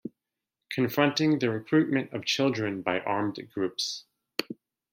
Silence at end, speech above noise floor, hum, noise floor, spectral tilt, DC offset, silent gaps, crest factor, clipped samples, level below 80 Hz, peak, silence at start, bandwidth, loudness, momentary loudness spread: 0.4 s; 59 dB; none; -87 dBFS; -5 dB/octave; under 0.1%; none; 22 dB; under 0.1%; -72 dBFS; -6 dBFS; 0.05 s; 16.5 kHz; -28 LUFS; 11 LU